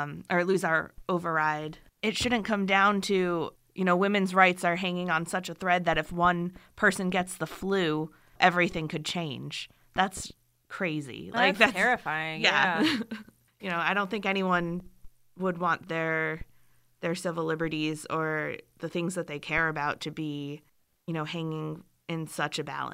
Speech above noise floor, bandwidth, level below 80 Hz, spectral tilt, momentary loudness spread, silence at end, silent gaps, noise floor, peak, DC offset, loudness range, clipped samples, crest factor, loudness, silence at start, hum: 37 dB; 16 kHz; -56 dBFS; -4.5 dB/octave; 14 LU; 0 s; none; -65 dBFS; -4 dBFS; under 0.1%; 6 LU; under 0.1%; 24 dB; -28 LUFS; 0 s; none